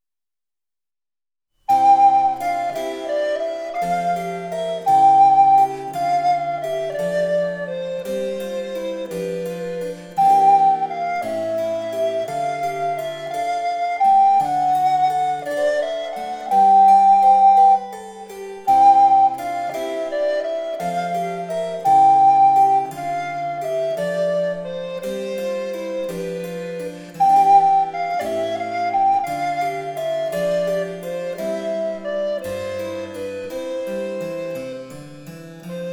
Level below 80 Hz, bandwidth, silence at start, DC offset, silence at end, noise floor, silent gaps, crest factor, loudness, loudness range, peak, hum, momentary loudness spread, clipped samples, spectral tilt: -60 dBFS; 16 kHz; 1.7 s; under 0.1%; 0 s; under -90 dBFS; none; 14 dB; -19 LUFS; 9 LU; -4 dBFS; none; 15 LU; under 0.1%; -5 dB/octave